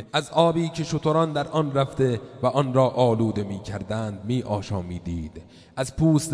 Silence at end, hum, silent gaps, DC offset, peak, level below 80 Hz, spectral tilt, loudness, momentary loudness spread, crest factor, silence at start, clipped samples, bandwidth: 0 s; none; none; under 0.1%; -4 dBFS; -48 dBFS; -6.5 dB/octave; -24 LUFS; 11 LU; 20 dB; 0 s; under 0.1%; 11 kHz